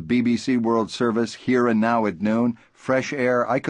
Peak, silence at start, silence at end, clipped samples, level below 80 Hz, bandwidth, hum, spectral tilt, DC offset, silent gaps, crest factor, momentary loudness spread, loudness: -8 dBFS; 0 s; 0 s; under 0.1%; -58 dBFS; 9.8 kHz; none; -6 dB/octave; under 0.1%; none; 14 dB; 5 LU; -22 LUFS